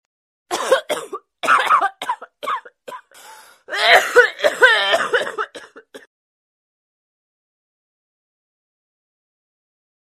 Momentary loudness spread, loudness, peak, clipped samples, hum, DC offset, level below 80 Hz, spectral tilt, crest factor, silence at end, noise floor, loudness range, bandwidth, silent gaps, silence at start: 18 LU; -17 LUFS; 0 dBFS; under 0.1%; none; under 0.1%; -66 dBFS; 0 dB/octave; 22 dB; 4.05 s; -44 dBFS; 9 LU; 15.5 kHz; none; 0.5 s